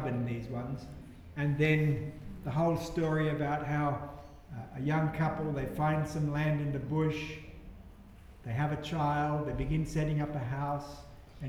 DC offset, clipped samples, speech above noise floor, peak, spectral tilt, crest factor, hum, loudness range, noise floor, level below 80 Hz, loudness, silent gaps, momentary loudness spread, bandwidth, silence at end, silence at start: under 0.1%; under 0.1%; 21 dB; -14 dBFS; -7.5 dB/octave; 18 dB; none; 3 LU; -52 dBFS; -50 dBFS; -33 LUFS; none; 17 LU; 13 kHz; 0 s; 0 s